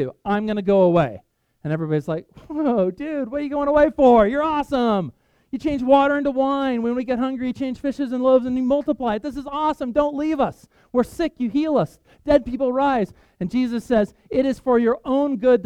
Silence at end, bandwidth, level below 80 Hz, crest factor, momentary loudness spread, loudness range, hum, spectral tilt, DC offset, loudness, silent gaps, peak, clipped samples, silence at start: 0 s; 12 kHz; -46 dBFS; 18 dB; 10 LU; 3 LU; none; -7.5 dB/octave; under 0.1%; -21 LUFS; none; -2 dBFS; under 0.1%; 0 s